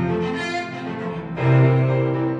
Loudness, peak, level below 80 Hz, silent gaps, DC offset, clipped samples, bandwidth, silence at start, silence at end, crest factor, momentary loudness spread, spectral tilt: -21 LUFS; -6 dBFS; -52 dBFS; none; under 0.1%; under 0.1%; 7.4 kHz; 0 s; 0 s; 14 dB; 12 LU; -8 dB/octave